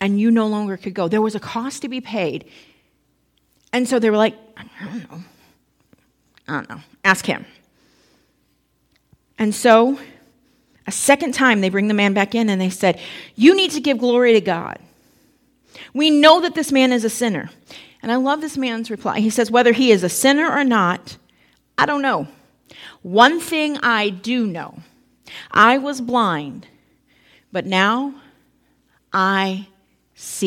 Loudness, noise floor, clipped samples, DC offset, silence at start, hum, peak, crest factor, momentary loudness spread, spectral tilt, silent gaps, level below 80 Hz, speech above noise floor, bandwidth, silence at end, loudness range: -17 LUFS; -64 dBFS; under 0.1%; under 0.1%; 0 s; none; 0 dBFS; 20 dB; 18 LU; -4 dB/octave; none; -64 dBFS; 47 dB; 17 kHz; 0 s; 8 LU